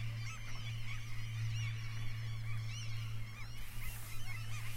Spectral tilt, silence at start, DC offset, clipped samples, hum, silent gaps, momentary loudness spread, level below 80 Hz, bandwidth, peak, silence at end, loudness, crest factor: -4 dB/octave; 0 s; under 0.1%; under 0.1%; none; none; 6 LU; -48 dBFS; 16 kHz; -28 dBFS; 0 s; -44 LUFS; 12 dB